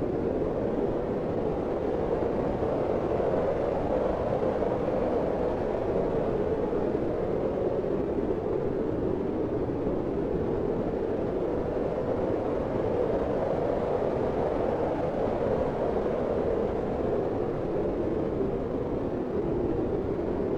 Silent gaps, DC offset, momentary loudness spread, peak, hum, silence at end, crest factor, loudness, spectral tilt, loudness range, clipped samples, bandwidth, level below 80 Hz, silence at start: none; under 0.1%; 2 LU; -14 dBFS; none; 0 s; 14 dB; -29 LUFS; -9 dB/octave; 2 LU; under 0.1%; 8.4 kHz; -44 dBFS; 0 s